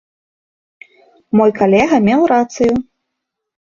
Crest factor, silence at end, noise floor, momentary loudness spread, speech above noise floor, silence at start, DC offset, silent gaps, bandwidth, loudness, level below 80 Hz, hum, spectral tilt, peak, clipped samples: 16 dB; 0.95 s; -77 dBFS; 5 LU; 65 dB; 1.35 s; under 0.1%; none; 7.4 kHz; -13 LUFS; -50 dBFS; none; -6.5 dB/octave; 0 dBFS; under 0.1%